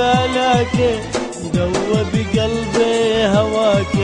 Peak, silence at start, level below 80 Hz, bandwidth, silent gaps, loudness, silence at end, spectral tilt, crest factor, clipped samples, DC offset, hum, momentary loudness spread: -2 dBFS; 0 s; -36 dBFS; 10.5 kHz; none; -17 LUFS; 0 s; -5.5 dB/octave; 14 dB; under 0.1%; under 0.1%; none; 6 LU